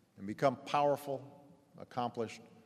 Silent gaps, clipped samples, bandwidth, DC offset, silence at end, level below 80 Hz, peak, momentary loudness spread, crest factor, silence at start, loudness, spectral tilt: none; under 0.1%; 15 kHz; under 0.1%; 0.2 s; -82 dBFS; -14 dBFS; 14 LU; 22 dB; 0.2 s; -36 LUFS; -6 dB/octave